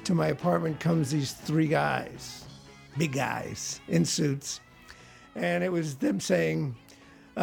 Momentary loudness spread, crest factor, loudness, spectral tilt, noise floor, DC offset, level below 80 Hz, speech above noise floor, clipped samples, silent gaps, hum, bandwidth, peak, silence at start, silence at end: 15 LU; 18 dB; -29 LUFS; -5.5 dB/octave; -53 dBFS; under 0.1%; -60 dBFS; 25 dB; under 0.1%; none; none; 17.5 kHz; -12 dBFS; 0 s; 0 s